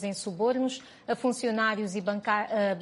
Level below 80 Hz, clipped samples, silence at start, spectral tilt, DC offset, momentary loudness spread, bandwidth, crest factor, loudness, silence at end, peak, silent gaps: -74 dBFS; under 0.1%; 0 s; -4.5 dB/octave; under 0.1%; 7 LU; 11.5 kHz; 16 dB; -29 LUFS; 0 s; -12 dBFS; none